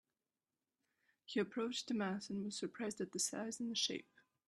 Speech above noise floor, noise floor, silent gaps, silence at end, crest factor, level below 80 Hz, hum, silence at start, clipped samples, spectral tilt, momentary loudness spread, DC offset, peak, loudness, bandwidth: over 48 dB; under -90 dBFS; none; 0.45 s; 18 dB; -84 dBFS; none; 1.3 s; under 0.1%; -3 dB/octave; 5 LU; under 0.1%; -24 dBFS; -41 LUFS; 13 kHz